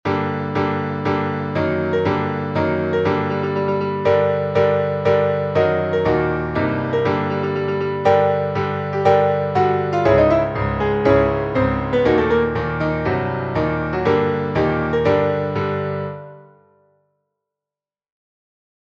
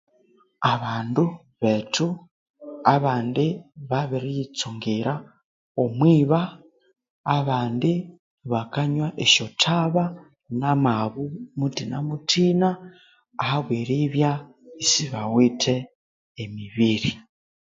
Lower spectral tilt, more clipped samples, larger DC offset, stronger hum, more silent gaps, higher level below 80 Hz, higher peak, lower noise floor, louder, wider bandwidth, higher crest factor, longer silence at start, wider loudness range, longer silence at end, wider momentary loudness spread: first, -8.5 dB/octave vs -5 dB/octave; neither; neither; first, 50 Hz at -45 dBFS vs none; second, none vs 2.31-2.54 s, 5.44-5.75 s, 7.10-7.24 s, 8.19-8.38 s, 15.95-16.35 s; first, -40 dBFS vs -60 dBFS; about the same, -2 dBFS vs -2 dBFS; first, under -90 dBFS vs -61 dBFS; first, -19 LUFS vs -23 LUFS; about the same, 7.2 kHz vs 7.8 kHz; second, 16 dB vs 22 dB; second, 0.05 s vs 0.6 s; about the same, 4 LU vs 3 LU; first, 2.45 s vs 0.55 s; second, 6 LU vs 14 LU